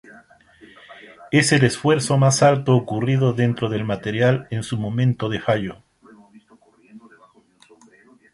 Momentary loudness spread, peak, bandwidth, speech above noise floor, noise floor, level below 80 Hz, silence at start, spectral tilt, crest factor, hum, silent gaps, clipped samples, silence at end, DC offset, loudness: 9 LU; 0 dBFS; 11.5 kHz; 36 dB; -54 dBFS; -54 dBFS; 0.9 s; -5.5 dB/octave; 20 dB; none; none; under 0.1%; 1.35 s; under 0.1%; -19 LUFS